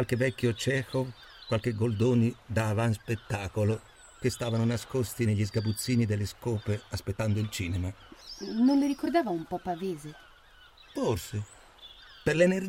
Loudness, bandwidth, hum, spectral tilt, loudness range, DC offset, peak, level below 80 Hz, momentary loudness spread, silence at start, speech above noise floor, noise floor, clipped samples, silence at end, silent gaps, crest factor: -30 LUFS; 16.5 kHz; none; -6.5 dB/octave; 2 LU; under 0.1%; -10 dBFS; -56 dBFS; 14 LU; 0 s; 27 dB; -56 dBFS; under 0.1%; 0 s; none; 18 dB